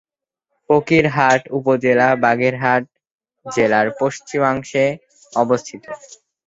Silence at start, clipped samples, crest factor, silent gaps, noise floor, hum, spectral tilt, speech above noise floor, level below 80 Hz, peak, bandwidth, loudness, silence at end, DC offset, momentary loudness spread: 0.7 s; under 0.1%; 16 dB; 3.12-3.19 s; -77 dBFS; none; -5.5 dB/octave; 60 dB; -56 dBFS; -2 dBFS; 8 kHz; -17 LUFS; 0.5 s; under 0.1%; 11 LU